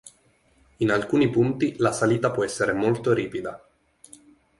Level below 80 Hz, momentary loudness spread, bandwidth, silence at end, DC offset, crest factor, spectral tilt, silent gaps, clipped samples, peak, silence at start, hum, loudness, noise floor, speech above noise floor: -58 dBFS; 6 LU; 11.5 kHz; 1 s; under 0.1%; 18 dB; -6 dB/octave; none; under 0.1%; -8 dBFS; 0.05 s; none; -23 LUFS; -62 dBFS; 39 dB